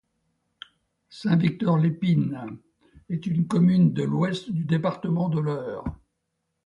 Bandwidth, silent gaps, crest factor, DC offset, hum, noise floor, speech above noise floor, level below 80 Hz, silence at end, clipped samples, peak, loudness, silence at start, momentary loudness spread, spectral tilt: 7.6 kHz; none; 16 dB; under 0.1%; none; -78 dBFS; 55 dB; -54 dBFS; 0.7 s; under 0.1%; -10 dBFS; -24 LUFS; 1.1 s; 13 LU; -8.5 dB/octave